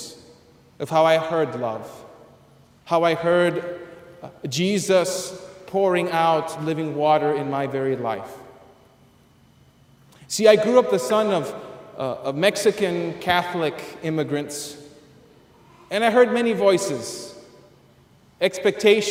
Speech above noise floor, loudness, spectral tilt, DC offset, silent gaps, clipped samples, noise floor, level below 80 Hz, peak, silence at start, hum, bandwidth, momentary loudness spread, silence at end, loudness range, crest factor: 34 dB; -21 LUFS; -4.5 dB/octave; under 0.1%; none; under 0.1%; -55 dBFS; -64 dBFS; -2 dBFS; 0 s; none; 16 kHz; 18 LU; 0 s; 4 LU; 22 dB